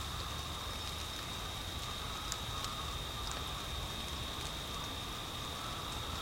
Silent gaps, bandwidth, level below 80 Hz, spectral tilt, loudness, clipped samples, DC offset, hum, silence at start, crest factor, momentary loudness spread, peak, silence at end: none; 16 kHz; -48 dBFS; -3 dB/octave; -40 LUFS; under 0.1%; under 0.1%; none; 0 s; 26 dB; 1 LU; -16 dBFS; 0 s